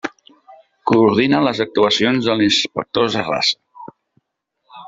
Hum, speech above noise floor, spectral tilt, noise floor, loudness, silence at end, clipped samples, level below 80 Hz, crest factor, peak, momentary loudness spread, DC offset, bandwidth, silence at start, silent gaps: none; 56 dB; -4.5 dB/octave; -72 dBFS; -16 LUFS; 0 s; under 0.1%; -56 dBFS; 18 dB; -2 dBFS; 7 LU; under 0.1%; 7.8 kHz; 0.05 s; none